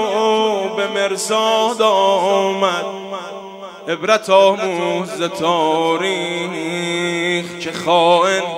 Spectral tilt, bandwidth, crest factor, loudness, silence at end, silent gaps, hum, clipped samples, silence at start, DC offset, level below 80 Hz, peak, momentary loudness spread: -3.5 dB/octave; 16 kHz; 16 dB; -16 LUFS; 0 s; none; none; under 0.1%; 0 s; under 0.1%; -68 dBFS; 0 dBFS; 12 LU